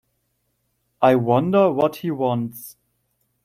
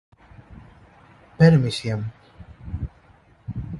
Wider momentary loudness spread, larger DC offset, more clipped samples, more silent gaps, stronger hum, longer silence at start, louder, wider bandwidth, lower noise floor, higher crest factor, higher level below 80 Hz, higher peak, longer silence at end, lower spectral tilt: second, 15 LU vs 22 LU; neither; neither; neither; neither; first, 1 s vs 0.5 s; about the same, -19 LUFS vs -21 LUFS; first, 16 kHz vs 11.5 kHz; first, -71 dBFS vs -54 dBFS; about the same, 20 dB vs 20 dB; second, -64 dBFS vs -42 dBFS; about the same, -2 dBFS vs -4 dBFS; first, 0.75 s vs 0 s; about the same, -7.5 dB/octave vs -7.5 dB/octave